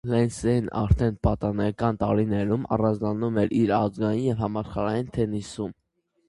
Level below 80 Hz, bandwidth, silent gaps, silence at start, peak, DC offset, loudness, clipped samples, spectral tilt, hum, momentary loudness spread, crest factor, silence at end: -38 dBFS; 11.5 kHz; none; 0.05 s; -6 dBFS; under 0.1%; -25 LUFS; under 0.1%; -8 dB/octave; none; 6 LU; 18 dB; 0.55 s